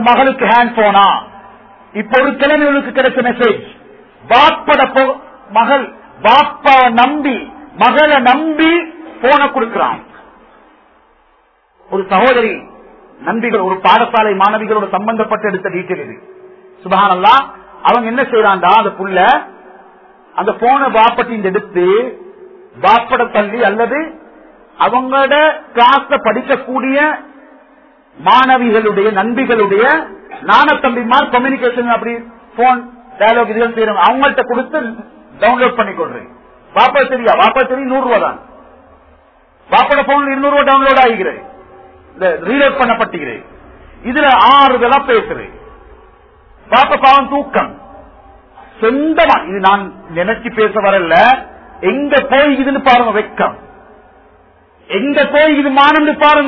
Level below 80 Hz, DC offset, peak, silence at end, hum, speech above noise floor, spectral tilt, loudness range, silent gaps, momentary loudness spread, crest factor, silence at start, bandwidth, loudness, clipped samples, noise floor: -46 dBFS; under 0.1%; 0 dBFS; 0 s; none; 42 dB; -6.5 dB/octave; 3 LU; none; 12 LU; 12 dB; 0 s; 6 kHz; -11 LUFS; 0.2%; -53 dBFS